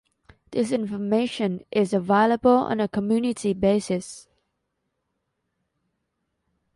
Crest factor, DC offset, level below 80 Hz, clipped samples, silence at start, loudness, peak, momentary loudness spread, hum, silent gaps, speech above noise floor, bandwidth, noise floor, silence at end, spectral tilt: 18 dB; under 0.1%; -58 dBFS; under 0.1%; 0.5 s; -23 LUFS; -6 dBFS; 10 LU; none; none; 55 dB; 11.5 kHz; -77 dBFS; 2.55 s; -6 dB/octave